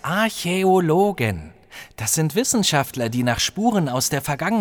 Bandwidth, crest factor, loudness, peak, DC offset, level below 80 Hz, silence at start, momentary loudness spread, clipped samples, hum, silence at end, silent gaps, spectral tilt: over 20 kHz; 16 dB; -20 LUFS; -4 dBFS; under 0.1%; -48 dBFS; 0.05 s; 9 LU; under 0.1%; none; 0 s; none; -4 dB/octave